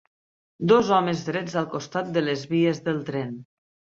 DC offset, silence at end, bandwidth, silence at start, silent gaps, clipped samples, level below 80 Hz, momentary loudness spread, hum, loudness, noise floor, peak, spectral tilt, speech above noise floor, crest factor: under 0.1%; 0.55 s; 7.8 kHz; 0.6 s; none; under 0.1%; -64 dBFS; 11 LU; none; -24 LUFS; under -90 dBFS; -6 dBFS; -6 dB/octave; over 66 dB; 18 dB